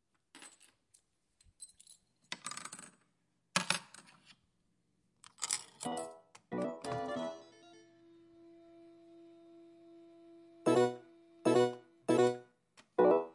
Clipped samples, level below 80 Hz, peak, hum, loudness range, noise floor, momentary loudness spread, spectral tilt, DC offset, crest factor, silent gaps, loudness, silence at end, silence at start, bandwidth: under 0.1%; -84 dBFS; -12 dBFS; none; 16 LU; -79 dBFS; 24 LU; -4 dB/octave; under 0.1%; 28 dB; none; -35 LUFS; 0.05 s; 0.35 s; 11.5 kHz